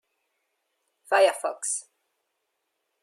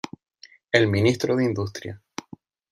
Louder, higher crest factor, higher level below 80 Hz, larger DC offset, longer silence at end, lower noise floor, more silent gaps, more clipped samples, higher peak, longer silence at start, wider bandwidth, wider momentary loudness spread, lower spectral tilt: second, -25 LUFS vs -22 LUFS; about the same, 22 dB vs 22 dB; second, under -90 dBFS vs -60 dBFS; neither; first, 1.2 s vs 0.75 s; first, -79 dBFS vs -48 dBFS; neither; neither; second, -8 dBFS vs -2 dBFS; first, 1.1 s vs 0.75 s; about the same, 14.5 kHz vs 13.5 kHz; second, 9 LU vs 19 LU; second, 1 dB/octave vs -6 dB/octave